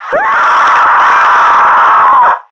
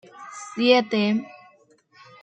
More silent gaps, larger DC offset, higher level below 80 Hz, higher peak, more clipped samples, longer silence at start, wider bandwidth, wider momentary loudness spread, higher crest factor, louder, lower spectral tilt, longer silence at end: neither; neither; first, -50 dBFS vs -74 dBFS; first, 0 dBFS vs -4 dBFS; neither; second, 0 s vs 0.2 s; about the same, 8.4 kHz vs 9.2 kHz; second, 3 LU vs 21 LU; second, 6 dB vs 22 dB; first, -6 LUFS vs -21 LUFS; second, -2 dB/octave vs -5 dB/octave; second, 0.1 s vs 0.95 s